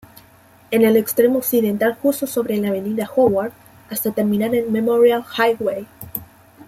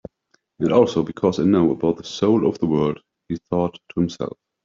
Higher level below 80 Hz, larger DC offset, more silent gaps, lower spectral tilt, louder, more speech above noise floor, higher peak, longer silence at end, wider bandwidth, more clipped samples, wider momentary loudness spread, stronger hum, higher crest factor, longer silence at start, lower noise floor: about the same, -58 dBFS vs -54 dBFS; neither; neither; second, -5 dB/octave vs -7.5 dB/octave; about the same, -18 LUFS vs -20 LUFS; second, 32 dB vs 46 dB; about the same, -4 dBFS vs -4 dBFS; second, 0.05 s vs 0.35 s; first, 16.5 kHz vs 7.6 kHz; neither; about the same, 14 LU vs 14 LU; neither; about the same, 16 dB vs 18 dB; about the same, 0.7 s vs 0.6 s; second, -49 dBFS vs -66 dBFS